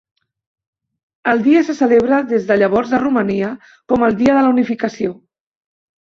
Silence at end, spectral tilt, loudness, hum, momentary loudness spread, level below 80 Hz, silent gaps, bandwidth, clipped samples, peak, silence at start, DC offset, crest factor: 0.95 s; -7 dB/octave; -15 LUFS; none; 10 LU; -52 dBFS; none; 7.4 kHz; under 0.1%; -2 dBFS; 1.25 s; under 0.1%; 14 dB